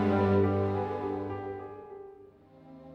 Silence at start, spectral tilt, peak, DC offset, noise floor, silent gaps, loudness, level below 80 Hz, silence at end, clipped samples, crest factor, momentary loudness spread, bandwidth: 0 s; -9.5 dB/octave; -14 dBFS; under 0.1%; -54 dBFS; none; -30 LUFS; -62 dBFS; 0 s; under 0.1%; 16 dB; 22 LU; 5.8 kHz